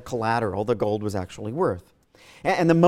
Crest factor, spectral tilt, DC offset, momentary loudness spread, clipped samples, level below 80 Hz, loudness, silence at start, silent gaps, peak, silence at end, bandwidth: 18 dB; -7 dB/octave; under 0.1%; 9 LU; under 0.1%; -54 dBFS; -25 LUFS; 0 s; none; -6 dBFS; 0 s; 14.5 kHz